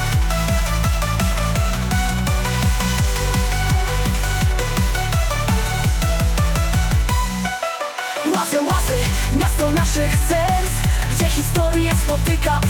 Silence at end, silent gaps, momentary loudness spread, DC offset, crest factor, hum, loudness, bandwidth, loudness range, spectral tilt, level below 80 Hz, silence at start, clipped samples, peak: 0 s; none; 2 LU; under 0.1%; 12 dB; none; -19 LUFS; 18 kHz; 1 LU; -4.5 dB/octave; -22 dBFS; 0 s; under 0.1%; -6 dBFS